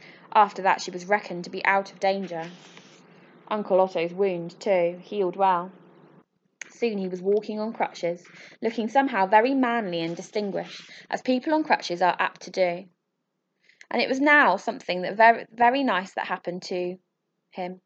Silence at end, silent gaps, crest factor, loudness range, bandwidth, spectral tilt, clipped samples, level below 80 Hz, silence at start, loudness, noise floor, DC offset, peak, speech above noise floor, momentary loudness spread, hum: 0.1 s; none; 22 dB; 6 LU; 8.2 kHz; -5 dB/octave; under 0.1%; -82 dBFS; 0.05 s; -24 LUFS; -78 dBFS; under 0.1%; -4 dBFS; 54 dB; 15 LU; none